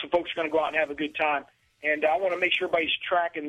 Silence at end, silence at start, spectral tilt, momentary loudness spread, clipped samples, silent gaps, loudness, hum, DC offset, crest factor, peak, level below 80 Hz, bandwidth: 0 s; 0 s; -4.5 dB/octave; 4 LU; under 0.1%; none; -26 LUFS; none; under 0.1%; 16 dB; -10 dBFS; -64 dBFS; 11.5 kHz